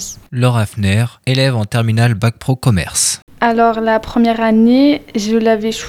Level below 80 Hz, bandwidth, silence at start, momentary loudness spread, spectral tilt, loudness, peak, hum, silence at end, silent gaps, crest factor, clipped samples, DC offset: -40 dBFS; 16 kHz; 0 s; 5 LU; -5.5 dB/octave; -14 LUFS; 0 dBFS; none; 0 s; 3.22-3.27 s; 14 dB; under 0.1%; under 0.1%